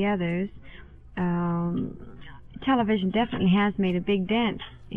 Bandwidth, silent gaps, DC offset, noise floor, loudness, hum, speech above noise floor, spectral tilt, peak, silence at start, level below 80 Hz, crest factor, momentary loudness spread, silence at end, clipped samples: 3.9 kHz; none; under 0.1%; -45 dBFS; -26 LUFS; none; 20 dB; -9.5 dB/octave; -12 dBFS; 0 s; -48 dBFS; 14 dB; 15 LU; 0 s; under 0.1%